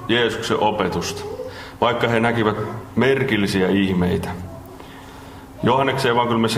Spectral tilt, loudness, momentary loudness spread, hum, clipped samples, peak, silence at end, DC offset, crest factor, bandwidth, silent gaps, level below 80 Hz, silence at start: -5.5 dB/octave; -20 LUFS; 20 LU; none; under 0.1%; -2 dBFS; 0 s; under 0.1%; 18 dB; 16 kHz; none; -48 dBFS; 0 s